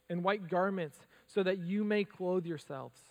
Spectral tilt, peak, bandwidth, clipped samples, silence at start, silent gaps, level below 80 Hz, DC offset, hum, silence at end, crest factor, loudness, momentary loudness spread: -7 dB/octave; -16 dBFS; 14 kHz; under 0.1%; 0.1 s; none; -84 dBFS; under 0.1%; none; 0.2 s; 20 dB; -35 LUFS; 10 LU